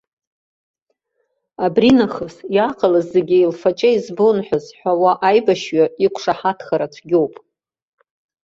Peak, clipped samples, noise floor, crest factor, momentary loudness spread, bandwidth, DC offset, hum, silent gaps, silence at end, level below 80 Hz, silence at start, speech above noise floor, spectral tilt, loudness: -2 dBFS; under 0.1%; -70 dBFS; 16 dB; 8 LU; 7.8 kHz; under 0.1%; none; none; 1.15 s; -58 dBFS; 1.6 s; 54 dB; -6 dB/octave; -17 LUFS